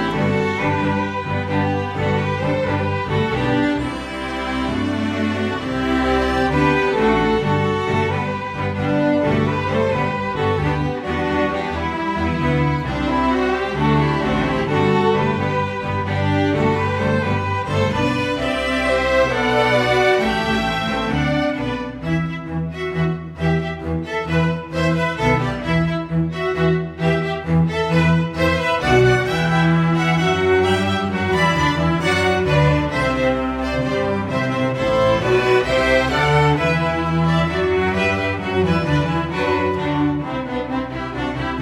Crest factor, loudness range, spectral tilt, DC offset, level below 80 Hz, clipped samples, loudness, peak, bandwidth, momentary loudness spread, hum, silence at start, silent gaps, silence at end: 16 dB; 4 LU; -6.5 dB/octave; under 0.1%; -36 dBFS; under 0.1%; -19 LUFS; -4 dBFS; 12.5 kHz; 6 LU; none; 0 s; none; 0 s